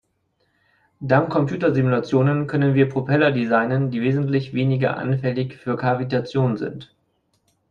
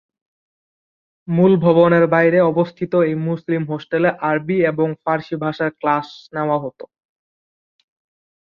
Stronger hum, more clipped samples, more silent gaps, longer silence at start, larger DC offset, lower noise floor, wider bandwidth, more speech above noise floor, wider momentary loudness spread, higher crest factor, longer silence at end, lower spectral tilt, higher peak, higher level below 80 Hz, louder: neither; neither; neither; second, 1 s vs 1.3 s; neither; second, -68 dBFS vs under -90 dBFS; first, 6.8 kHz vs 6 kHz; second, 49 dB vs over 73 dB; second, 7 LU vs 10 LU; about the same, 18 dB vs 18 dB; second, 0.85 s vs 1.85 s; about the same, -9 dB/octave vs -9.5 dB/octave; about the same, -2 dBFS vs -2 dBFS; about the same, -58 dBFS vs -60 dBFS; second, -21 LUFS vs -18 LUFS